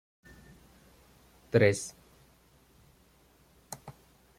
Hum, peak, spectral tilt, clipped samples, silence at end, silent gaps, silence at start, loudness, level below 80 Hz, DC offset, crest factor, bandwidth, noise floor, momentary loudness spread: none; -8 dBFS; -5.5 dB/octave; under 0.1%; 0.5 s; none; 1.55 s; -28 LUFS; -64 dBFS; under 0.1%; 26 dB; 16 kHz; -63 dBFS; 26 LU